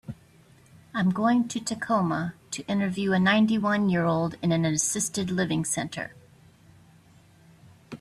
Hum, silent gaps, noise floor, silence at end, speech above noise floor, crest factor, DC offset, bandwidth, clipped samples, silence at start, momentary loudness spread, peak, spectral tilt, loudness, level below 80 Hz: none; none; -56 dBFS; 0.05 s; 31 dB; 18 dB; under 0.1%; 14 kHz; under 0.1%; 0.1 s; 13 LU; -10 dBFS; -4.5 dB/octave; -26 LUFS; -62 dBFS